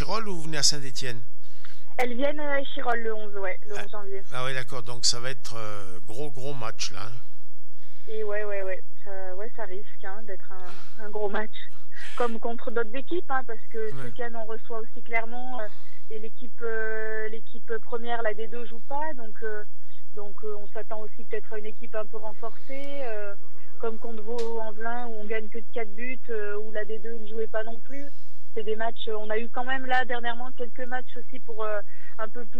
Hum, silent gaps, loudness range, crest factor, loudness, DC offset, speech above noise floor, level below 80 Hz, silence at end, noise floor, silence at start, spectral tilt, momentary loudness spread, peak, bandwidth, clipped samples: none; none; 6 LU; 26 dB; -33 LUFS; 20%; 30 dB; -72 dBFS; 0 s; -63 dBFS; 0 s; -3.5 dB/octave; 14 LU; -4 dBFS; over 20 kHz; under 0.1%